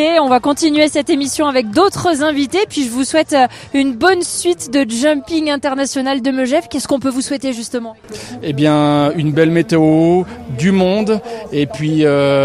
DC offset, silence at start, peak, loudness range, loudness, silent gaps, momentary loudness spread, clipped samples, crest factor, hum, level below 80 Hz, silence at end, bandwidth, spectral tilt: under 0.1%; 0 s; 0 dBFS; 3 LU; -14 LUFS; none; 8 LU; under 0.1%; 14 dB; none; -50 dBFS; 0 s; 14.5 kHz; -5 dB/octave